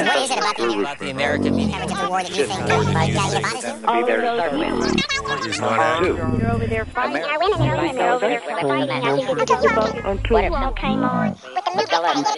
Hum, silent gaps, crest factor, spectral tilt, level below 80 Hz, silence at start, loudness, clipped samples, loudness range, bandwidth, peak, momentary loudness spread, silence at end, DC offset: none; none; 16 dB; -5 dB/octave; -36 dBFS; 0 s; -20 LUFS; under 0.1%; 1 LU; 11.5 kHz; -4 dBFS; 5 LU; 0 s; under 0.1%